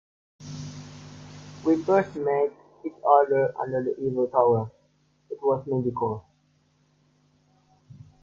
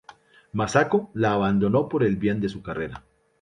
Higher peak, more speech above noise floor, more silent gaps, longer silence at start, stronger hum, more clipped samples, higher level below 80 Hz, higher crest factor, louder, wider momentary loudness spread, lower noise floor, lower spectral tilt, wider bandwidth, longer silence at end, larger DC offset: about the same, -4 dBFS vs -4 dBFS; first, 42 dB vs 28 dB; neither; second, 0.4 s vs 0.55 s; first, 50 Hz at -55 dBFS vs none; neither; second, -64 dBFS vs -52 dBFS; about the same, 22 dB vs 20 dB; about the same, -25 LUFS vs -24 LUFS; first, 22 LU vs 11 LU; first, -66 dBFS vs -51 dBFS; first, -8 dB/octave vs -6.5 dB/octave; second, 7.4 kHz vs 10.5 kHz; second, 0.3 s vs 0.45 s; neither